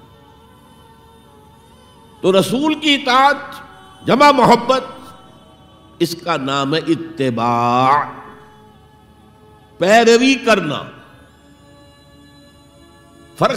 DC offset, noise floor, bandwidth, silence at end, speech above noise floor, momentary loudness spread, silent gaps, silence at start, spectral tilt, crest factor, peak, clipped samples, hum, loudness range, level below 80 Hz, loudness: under 0.1%; -46 dBFS; 16 kHz; 0 s; 32 dB; 17 LU; none; 2.25 s; -4.5 dB/octave; 18 dB; 0 dBFS; under 0.1%; none; 5 LU; -54 dBFS; -15 LUFS